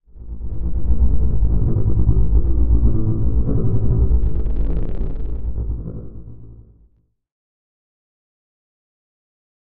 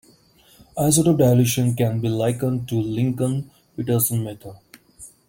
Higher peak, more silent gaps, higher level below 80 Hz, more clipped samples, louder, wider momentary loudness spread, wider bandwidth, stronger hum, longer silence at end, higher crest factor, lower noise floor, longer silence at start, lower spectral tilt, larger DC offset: about the same, -4 dBFS vs -4 dBFS; neither; first, -20 dBFS vs -54 dBFS; neither; about the same, -21 LUFS vs -20 LUFS; about the same, 15 LU vs 16 LU; second, 1.5 kHz vs 17 kHz; neither; first, 2.4 s vs 0.2 s; about the same, 14 dB vs 18 dB; about the same, -57 dBFS vs -54 dBFS; second, 0 s vs 0.75 s; first, -13.5 dB/octave vs -6 dB/octave; first, 9% vs under 0.1%